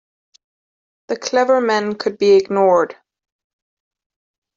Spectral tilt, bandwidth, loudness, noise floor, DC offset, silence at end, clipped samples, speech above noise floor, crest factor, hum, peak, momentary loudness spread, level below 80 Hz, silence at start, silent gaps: -4.5 dB/octave; 7.6 kHz; -16 LUFS; under -90 dBFS; under 0.1%; 1.65 s; under 0.1%; over 75 dB; 16 dB; none; -2 dBFS; 11 LU; -64 dBFS; 1.1 s; none